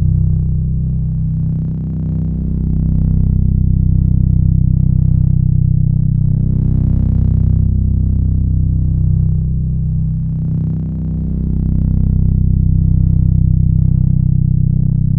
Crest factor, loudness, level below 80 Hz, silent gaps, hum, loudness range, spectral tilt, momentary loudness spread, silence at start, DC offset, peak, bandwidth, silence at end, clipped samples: 12 dB; -15 LUFS; -18 dBFS; none; none; 3 LU; -14.5 dB/octave; 5 LU; 0 s; under 0.1%; 0 dBFS; 1.2 kHz; 0 s; under 0.1%